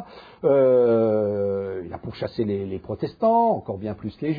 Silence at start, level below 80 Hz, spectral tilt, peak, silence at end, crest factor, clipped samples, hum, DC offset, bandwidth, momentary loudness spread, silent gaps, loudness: 0 s; -56 dBFS; -10.5 dB/octave; -8 dBFS; 0 s; 14 dB; under 0.1%; none; under 0.1%; 5 kHz; 14 LU; none; -23 LUFS